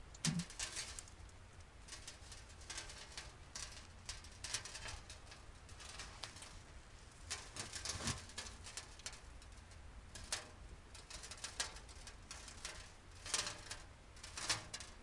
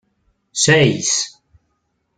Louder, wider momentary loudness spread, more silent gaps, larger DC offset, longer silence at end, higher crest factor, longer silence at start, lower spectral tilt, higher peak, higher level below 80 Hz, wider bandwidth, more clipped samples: second, -47 LUFS vs -16 LUFS; about the same, 17 LU vs 15 LU; neither; neither; second, 0 s vs 0.9 s; first, 28 dB vs 18 dB; second, 0 s vs 0.55 s; about the same, -2 dB/octave vs -3 dB/octave; second, -20 dBFS vs -2 dBFS; second, -60 dBFS vs -54 dBFS; first, 11.5 kHz vs 9.6 kHz; neither